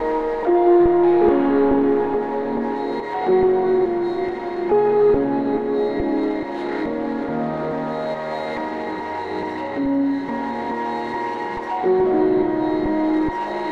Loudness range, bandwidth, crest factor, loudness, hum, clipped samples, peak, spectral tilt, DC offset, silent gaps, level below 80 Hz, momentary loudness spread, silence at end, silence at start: 7 LU; 6 kHz; 14 dB; -20 LUFS; none; under 0.1%; -6 dBFS; -8 dB/octave; 0.3%; none; -46 dBFS; 10 LU; 0 s; 0 s